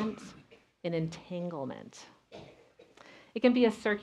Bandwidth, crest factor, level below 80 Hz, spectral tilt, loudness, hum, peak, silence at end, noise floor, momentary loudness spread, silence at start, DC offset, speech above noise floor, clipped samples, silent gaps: 10.5 kHz; 22 dB; -70 dBFS; -6.5 dB/octave; -32 LUFS; none; -12 dBFS; 0 s; -59 dBFS; 25 LU; 0 s; under 0.1%; 28 dB; under 0.1%; none